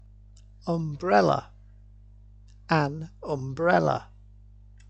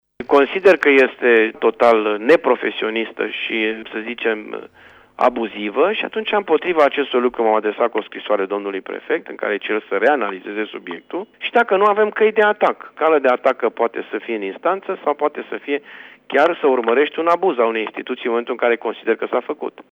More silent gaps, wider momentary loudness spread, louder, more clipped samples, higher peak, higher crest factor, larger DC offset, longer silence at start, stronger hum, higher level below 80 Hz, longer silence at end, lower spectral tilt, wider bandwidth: neither; about the same, 11 LU vs 11 LU; second, -26 LUFS vs -18 LUFS; neither; second, -8 dBFS vs -2 dBFS; about the same, 20 dB vs 16 dB; neither; first, 0.65 s vs 0.2 s; first, 50 Hz at -50 dBFS vs none; first, -52 dBFS vs -64 dBFS; first, 0.85 s vs 0.1 s; first, -7 dB/octave vs -5.5 dB/octave; first, 8.4 kHz vs 7.6 kHz